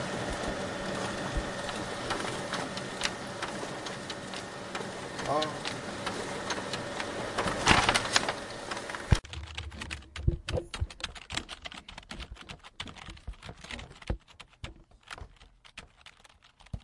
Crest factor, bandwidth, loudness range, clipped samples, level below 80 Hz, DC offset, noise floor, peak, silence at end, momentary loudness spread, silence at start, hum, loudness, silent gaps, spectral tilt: 32 dB; 11.5 kHz; 15 LU; under 0.1%; -44 dBFS; under 0.1%; -59 dBFS; -4 dBFS; 0 s; 18 LU; 0 s; none; -33 LUFS; none; -3.5 dB/octave